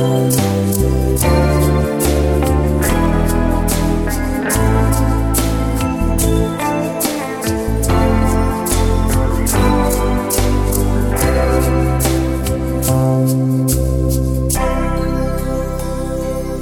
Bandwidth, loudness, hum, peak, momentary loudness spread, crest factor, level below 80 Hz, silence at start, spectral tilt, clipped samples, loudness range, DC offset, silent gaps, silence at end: 18.5 kHz; -16 LUFS; none; -2 dBFS; 5 LU; 14 dB; -20 dBFS; 0 s; -5.5 dB/octave; under 0.1%; 2 LU; under 0.1%; none; 0 s